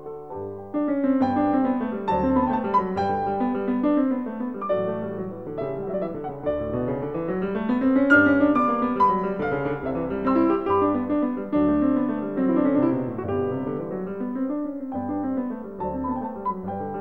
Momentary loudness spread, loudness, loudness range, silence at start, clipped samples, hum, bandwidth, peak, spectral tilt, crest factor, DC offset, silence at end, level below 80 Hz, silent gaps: 10 LU; -24 LUFS; 7 LU; 0 s; under 0.1%; none; 4.7 kHz; -6 dBFS; -9 dB/octave; 18 dB; 0.3%; 0 s; -50 dBFS; none